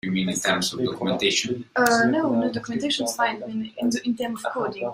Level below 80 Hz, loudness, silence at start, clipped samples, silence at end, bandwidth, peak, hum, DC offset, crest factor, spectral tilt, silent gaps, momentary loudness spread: -62 dBFS; -24 LUFS; 0.05 s; under 0.1%; 0 s; 16 kHz; -4 dBFS; none; under 0.1%; 20 dB; -3.5 dB/octave; none; 8 LU